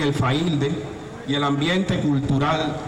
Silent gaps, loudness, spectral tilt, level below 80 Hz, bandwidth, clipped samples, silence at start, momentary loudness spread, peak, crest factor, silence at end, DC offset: none; -22 LUFS; -6.5 dB/octave; -44 dBFS; 11.5 kHz; under 0.1%; 0 s; 8 LU; -10 dBFS; 10 dB; 0 s; under 0.1%